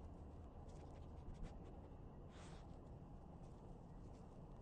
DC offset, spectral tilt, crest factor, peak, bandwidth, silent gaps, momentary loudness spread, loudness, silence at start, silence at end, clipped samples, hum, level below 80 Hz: under 0.1%; -7.5 dB/octave; 16 dB; -40 dBFS; 9.6 kHz; none; 3 LU; -59 LUFS; 0 s; 0 s; under 0.1%; none; -60 dBFS